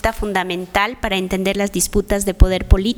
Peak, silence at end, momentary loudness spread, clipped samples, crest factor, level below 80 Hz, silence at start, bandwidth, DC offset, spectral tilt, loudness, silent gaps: 0 dBFS; 0 s; 4 LU; under 0.1%; 16 dB; -20 dBFS; 0.05 s; 18.5 kHz; under 0.1%; -4.5 dB/octave; -18 LUFS; none